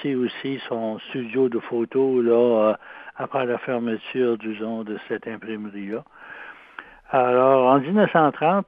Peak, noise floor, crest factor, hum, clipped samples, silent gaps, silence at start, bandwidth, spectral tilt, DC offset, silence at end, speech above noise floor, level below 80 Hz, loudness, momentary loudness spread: -4 dBFS; -44 dBFS; 18 dB; none; under 0.1%; none; 0 s; 4.9 kHz; -9.5 dB/octave; under 0.1%; 0.05 s; 22 dB; -68 dBFS; -22 LUFS; 20 LU